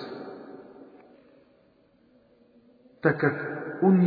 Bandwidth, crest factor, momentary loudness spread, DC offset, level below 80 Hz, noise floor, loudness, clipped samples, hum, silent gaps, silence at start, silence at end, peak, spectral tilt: 4.9 kHz; 22 dB; 25 LU; under 0.1%; -72 dBFS; -62 dBFS; -27 LUFS; under 0.1%; none; none; 0 s; 0 s; -6 dBFS; -11.5 dB/octave